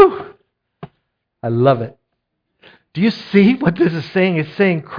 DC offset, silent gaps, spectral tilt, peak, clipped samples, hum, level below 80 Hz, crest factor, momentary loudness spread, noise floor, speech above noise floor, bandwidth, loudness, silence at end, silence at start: under 0.1%; none; -9 dB/octave; 0 dBFS; under 0.1%; none; -54 dBFS; 16 dB; 17 LU; -73 dBFS; 58 dB; 5.2 kHz; -16 LUFS; 0 s; 0 s